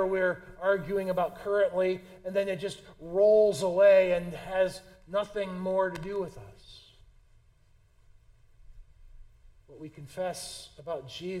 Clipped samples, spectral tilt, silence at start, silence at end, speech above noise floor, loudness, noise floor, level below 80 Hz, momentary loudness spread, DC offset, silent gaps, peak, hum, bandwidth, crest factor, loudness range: under 0.1%; -5 dB/octave; 0 s; 0 s; 34 dB; -28 LUFS; -62 dBFS; -56 dBFS; 21 LU; under 0.1%; none; -10 dBFS; none; 14 kHz; 18 dB; 17 LU